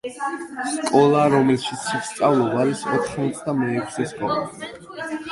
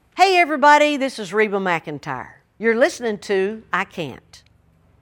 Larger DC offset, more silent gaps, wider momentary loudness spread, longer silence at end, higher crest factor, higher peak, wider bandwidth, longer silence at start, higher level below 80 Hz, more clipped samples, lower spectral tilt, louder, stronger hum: neither; neither; about the same, 14 LU vs 16 LU; second, 0 s vs 0.65 s; about the same, 18 dB vs 20 dB; about the same, -2 dBFS vs 0 dBFS; second, 11.5 kHz vs 17.5 kHz; about the same, 0.05 s vs 0.15 s; about the same, -58 dBFS vs -62 dBFS; neither; first, -5.5 dB/octave vs -4 dB/octave; second, -21 LUFS vs -18 LUFS; neither